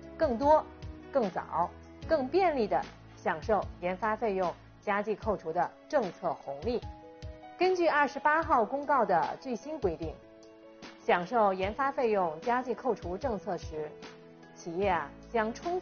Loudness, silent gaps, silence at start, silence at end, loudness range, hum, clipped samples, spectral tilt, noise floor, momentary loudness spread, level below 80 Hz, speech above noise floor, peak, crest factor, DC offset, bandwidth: -31 LUFS; none; 0 s; 0 s; 4 LU; none; under 0.1%; -4 dB/octave; -53 dBFS; 16 LU; -54 dBFS; 23 dB; -12 dBFS; 18 dB; under 0.1%; 6.8 kHz